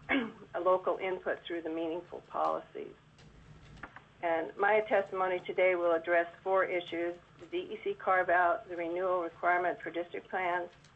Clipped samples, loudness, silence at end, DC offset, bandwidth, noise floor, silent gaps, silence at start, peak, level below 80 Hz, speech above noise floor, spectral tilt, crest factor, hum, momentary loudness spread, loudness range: under 0.1%; -32 LUFS; 0.25 s; under 0.1%; 8 kHz; -56 dBFS; none; 0 s; -16 dBFS; -68 dBFS; 24 dB; -6 dB/octave; 16 dB; none; 12 LU; 7 LU